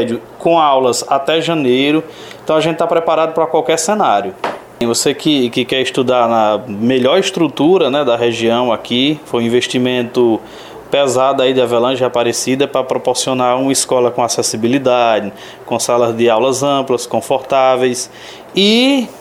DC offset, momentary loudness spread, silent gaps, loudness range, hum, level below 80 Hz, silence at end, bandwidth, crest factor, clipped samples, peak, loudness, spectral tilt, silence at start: under 0.1%; 7 LU; none; 1 LU; none; -56 dBFS; 0 s; 16 kHz; 12 dB; under 0.1%; -2 dBFS; -14 LUFS; -4 dB/octave; 0 s